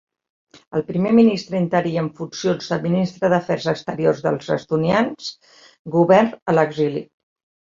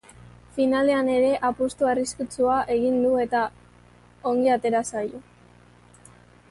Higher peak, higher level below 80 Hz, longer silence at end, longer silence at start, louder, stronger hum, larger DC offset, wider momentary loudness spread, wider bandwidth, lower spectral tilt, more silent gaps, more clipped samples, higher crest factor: first, -2 dBFS vs -10 dBFS; about the same, -60 dBFS vs -56 dBFS; second, 0.7 s vs 1.3 s; first, 0.75 s vs 0.25 s; first, -19 LUFS vs -23 LUFS; second, none vs 60 Hz at -50 dBFS; neither; about the same, 11 LU vs 10 LU; second, 7.6 kHz vs 11.5 kHz; first, -7 dB/octave vs -4.5 dB/octave; first, 5.79-5.85 s, 6.42-6.46 s vs none; neither; about the same, 18 dB vs 14 dB